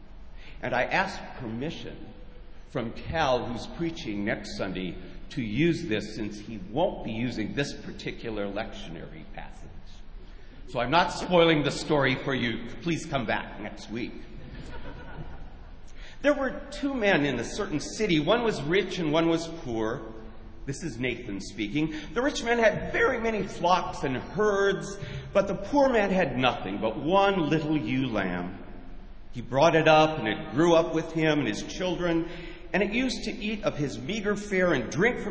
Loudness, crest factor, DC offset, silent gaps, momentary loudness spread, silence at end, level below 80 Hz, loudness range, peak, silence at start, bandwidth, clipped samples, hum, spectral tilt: -27 LUFS; 22 dB; under 0.1%; none; 19 LU; 0 s; -46 dBFS; 8 LU; -6 dBFS; 0 s; 8 kHz; under 0.1%; none; -5.5 dB/octave